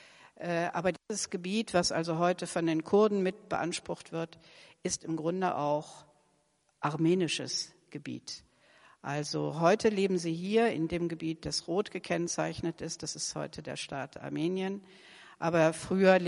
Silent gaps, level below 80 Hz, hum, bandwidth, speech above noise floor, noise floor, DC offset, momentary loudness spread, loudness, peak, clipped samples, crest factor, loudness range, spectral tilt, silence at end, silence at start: none; -64 dBFS; none; 11.5 kHz; 41 dB; -73 dBFS; under 0.1%; 12 LU; -32 LUFS; -10 dBFS; under 0.1%; 22 dB; 5 LU; -4.5 dB/octave; 0 s; 0.25 s